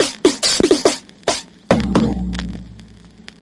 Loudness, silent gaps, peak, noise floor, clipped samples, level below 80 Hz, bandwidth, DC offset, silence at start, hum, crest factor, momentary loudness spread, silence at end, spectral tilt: -17 LUFS; none; -2 dBFS; -42 dBFS; under 0.1%; -34 dBFS; 11.5 kHz; under 0.1%; 0 s; none; 18 dB; 12 LU; 0.55 s; -4 dB/octave